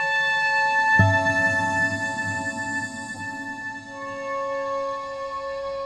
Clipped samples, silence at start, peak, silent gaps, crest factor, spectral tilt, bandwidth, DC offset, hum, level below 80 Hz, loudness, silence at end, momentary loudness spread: under 0.1%; 0 s; -4 dBFS; none; 20 dB; -4.5 dB/octave; 11.5 kHz; under 0.1%; none; -54 dBFS; -23 LUFS; 0 s; 14 LU